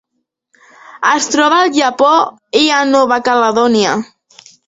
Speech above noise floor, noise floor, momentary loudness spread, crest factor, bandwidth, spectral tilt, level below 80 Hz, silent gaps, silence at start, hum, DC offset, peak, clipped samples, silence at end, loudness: 59 dB; -71 dBFS; 6 LU; 14 dB; 8 kHz; -2.5 dB/octave; -58 dBFS; none; 0.95 s; none; under 0.1%; 0 dBFS; under 0.1%; 0.65 s; -12 LUFS